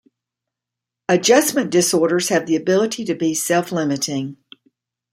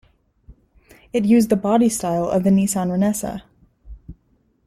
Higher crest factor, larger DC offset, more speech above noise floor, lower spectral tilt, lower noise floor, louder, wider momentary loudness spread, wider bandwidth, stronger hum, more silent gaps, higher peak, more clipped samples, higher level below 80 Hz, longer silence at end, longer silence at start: about the same, 18 dB vs 16 dB; neither; first, 67 dB vs 44 dB; second, -3.5 dB/octave vs -6 dB/octave; first, -85 dBFS vs -62 dBFS; about the same, -18 LUFS vs -19 LUFS; about the same, 9 LU vs 10 LU; about the same, 16 kHz vs 15.5 kHz; neither; neither; about the same, -2 dBFS vs -4 dBFS; neither; second, -66 dBFS vs -48 dBFS; first, 0.8 s vs 0.55 s; first, 1.1 s vs 0.5 s